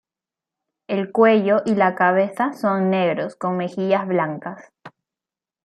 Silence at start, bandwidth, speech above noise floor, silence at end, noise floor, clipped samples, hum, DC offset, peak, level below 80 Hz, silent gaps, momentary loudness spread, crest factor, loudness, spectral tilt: 0.9 s; 12 kHz; 70 dB; 0.75 s; -90 dBFS; under 0.1%; none; under 0.1%; -2 dBFS; -72 dBFS; none; 11 LU; 18 dB; -20 LUFS; -7.5 dB/octave